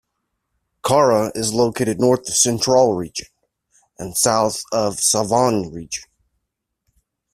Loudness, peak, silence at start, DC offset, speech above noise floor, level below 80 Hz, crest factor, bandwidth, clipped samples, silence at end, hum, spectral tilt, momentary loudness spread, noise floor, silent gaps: -18 LUFS; -2 dBFS; 0.85 s; under 0.1%; 60 dB; -54 dBFS; 18 dB; 16 kHz; under 0.1%; 1.3 s; none; -3.5 dB/octave; 14 LU; -78 dBFS; none